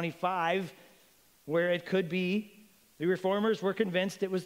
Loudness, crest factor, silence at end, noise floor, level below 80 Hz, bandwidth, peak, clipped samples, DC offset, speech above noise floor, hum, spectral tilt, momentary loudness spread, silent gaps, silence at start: -31 LUFS; 16 dB; 0 s; -64 dBFS; -78 dBFS; 16 kHz; -14 dBFS; under 0.1%; under 0.1%; 33 dB; none; -6 dB/octave; 6 LU; none; 0 s